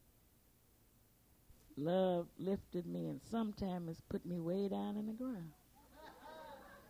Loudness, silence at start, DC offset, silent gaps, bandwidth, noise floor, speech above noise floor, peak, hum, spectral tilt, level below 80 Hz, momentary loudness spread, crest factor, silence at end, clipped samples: -42 LUFS; 1.5 s; under 0.1%; none; 16.5 kHz; -70 dBFS; 30 dB; -26 dBFS; none; -8 dB/octave; -68 dBFS; 18 LU; 18 dB; 0 s; under 0.1%